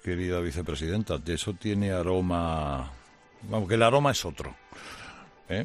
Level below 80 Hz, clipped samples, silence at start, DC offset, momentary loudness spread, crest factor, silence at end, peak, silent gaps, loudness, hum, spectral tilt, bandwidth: -46 dBFS; under 0.1%; 0.05 s; under 0.1%; 20 LU; 22 dB; 0 s; -6 dBFS; none; -28 LUFS; none; -5.5 dB/octave; 13.5 kHz